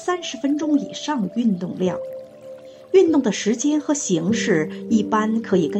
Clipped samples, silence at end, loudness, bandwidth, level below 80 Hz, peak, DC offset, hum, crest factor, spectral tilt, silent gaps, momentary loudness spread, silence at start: under 0.1%; 0 s; -21 LUFS; 8.8 kHz; -64 dBFS; -4 dBFS; under 0.1%; none; 16 dB; -5 dB/octave; none; 15 LU; 0 s